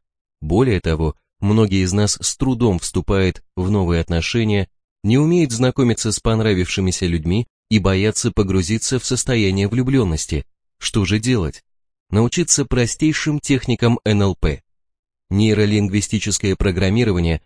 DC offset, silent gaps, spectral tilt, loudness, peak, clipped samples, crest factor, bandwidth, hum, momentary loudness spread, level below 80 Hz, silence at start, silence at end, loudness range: under 0.1%; 4.84-4.96 s, 7.50-7.63 s, 12.00-12.06 s, 14.99-15.03 s; -5 dB/octave; -18 LUFS; 0 dBFS; under 0.1%; 18 dB; 10.5 kHz; none; 6 LU; -32 dBFS; 0.4 s; 0.05 s; 1 LU